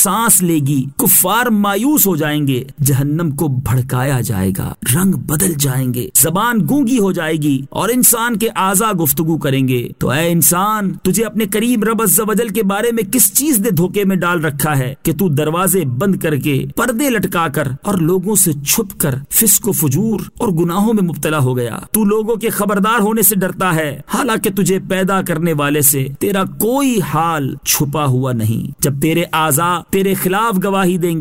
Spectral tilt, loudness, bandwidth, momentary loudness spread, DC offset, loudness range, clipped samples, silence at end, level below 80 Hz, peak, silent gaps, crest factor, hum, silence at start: -4.5 dB/octave; -14 LUFS; 16.5 kHz; 7 LU; 0.6%; 2 LU; under 0.1%; 0 s; -44 dBFS; 0 dBFS; none; 14 dB; none; 0 s